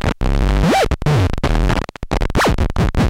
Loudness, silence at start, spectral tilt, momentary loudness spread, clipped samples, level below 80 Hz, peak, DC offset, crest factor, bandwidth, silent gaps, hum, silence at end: -17 LUFS; 0.05 s; -6 dB/octave; 6 LU; under 0.1%; -20 dBFS; -4 dBFS; under 0.1%; 12 dB; 16 kHz; none; none; 0 s